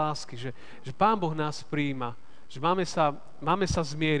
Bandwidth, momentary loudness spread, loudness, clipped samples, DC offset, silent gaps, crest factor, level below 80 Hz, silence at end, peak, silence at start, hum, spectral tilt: 10 kHz; 14 LU; -29 LUFS; under 0.1%; 1%; none; 20 dB; -50 dBFS; 0 s; -10 dBFS; 0 s; none; -5.5 dB/octave